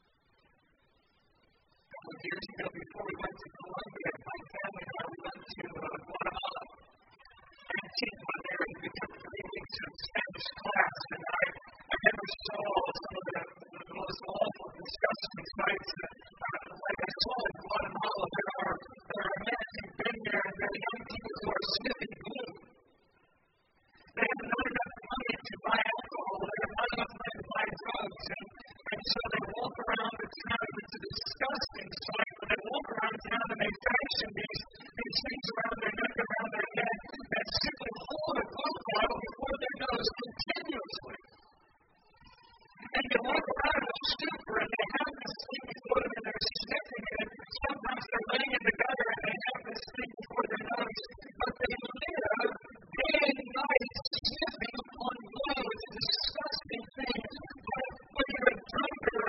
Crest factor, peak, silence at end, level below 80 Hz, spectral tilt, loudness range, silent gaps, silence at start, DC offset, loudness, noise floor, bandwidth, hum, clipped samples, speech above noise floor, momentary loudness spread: 28 dB; -10 dBFS; 0 s; -58 dBFS; -1 dB/octave; 7 LU; 54.07-54.11 s; 1.9 s; under 0.1%; -35 LUFS; -72 dBFS; 6 kHz; none; under 0.1%; 35 dB; 12 LU